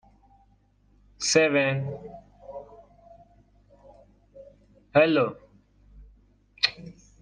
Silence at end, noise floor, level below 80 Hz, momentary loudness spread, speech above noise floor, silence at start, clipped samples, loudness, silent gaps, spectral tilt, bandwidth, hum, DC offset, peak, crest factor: 0.3 s; -62 dBFS; -60 dBFS; 25 LU; 39 dB; 1.2 s; under 0.1%; -24 LUFS; none; -4 dB/octave; 9.6 kHz; 50 Hz at -60 dBFS; under 0.1%; -6 dBFS; 24 dB